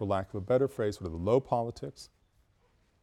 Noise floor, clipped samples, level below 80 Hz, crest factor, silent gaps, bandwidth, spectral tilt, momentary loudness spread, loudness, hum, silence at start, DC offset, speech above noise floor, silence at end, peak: -69 dBFS; under 0.1%; -56 dBFS; 20 dB; none; 13 kHz; -7.5 dB/octave; 16 LU; -31 LUFS; none; 0 s; under 0.1%; 38 dB; 0.95 s; -12 dBFS